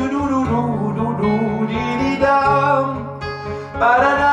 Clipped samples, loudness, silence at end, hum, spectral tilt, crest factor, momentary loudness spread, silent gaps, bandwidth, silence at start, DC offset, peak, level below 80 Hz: under 0.1%; -18 LUFS; 0 s; none; -7 dB/octave; 14 dB; 12 LU; none; 9.8 kHz; 0 s; under 0.1%; -2 dBFS; -42 dBFS